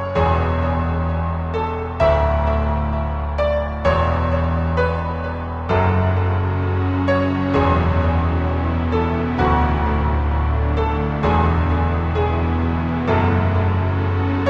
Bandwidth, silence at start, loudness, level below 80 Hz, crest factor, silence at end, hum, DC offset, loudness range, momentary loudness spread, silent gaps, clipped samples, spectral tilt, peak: 6 kHz; 0 s; -19 LUFS; -24 dBFS; 14 dB; 0 s; none; under 0.1%; 2 LU; 5 LU; none; under 0.1%; -9 dB/octave; -4 dBFS